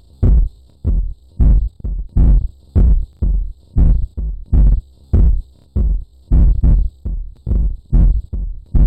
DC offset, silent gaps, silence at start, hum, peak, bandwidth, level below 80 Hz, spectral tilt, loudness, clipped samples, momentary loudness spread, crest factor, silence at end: under 0.1%; none; 0.2 s; none; -6 dBFS; 1.6 kHz; -14 dBFS; -11.5 dB/octave; -18 LUFS; under 0.1%; 11 LU; 8 dB; 0 s